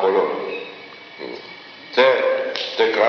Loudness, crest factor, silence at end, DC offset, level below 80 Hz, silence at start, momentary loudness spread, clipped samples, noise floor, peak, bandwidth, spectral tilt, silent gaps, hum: -20 LUFS; 18 dB; 0 s; under 0.1%; -78 dBFS; 0 s; 21 LU; under 0.1%; -39 dBFS; -2 dBFS; 6.6 kHz; 0 dB/octave; none; none